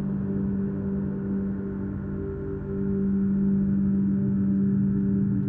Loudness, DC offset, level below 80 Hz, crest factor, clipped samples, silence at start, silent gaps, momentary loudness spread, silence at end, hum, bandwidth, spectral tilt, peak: -26 LUFS; under 0.1%; -44 dBFS; 10 dB; under 0.1%; 0 s; none; 8 LU; 0 s; none; 2 kHz; -13.5 dB/octave; -14 dBFS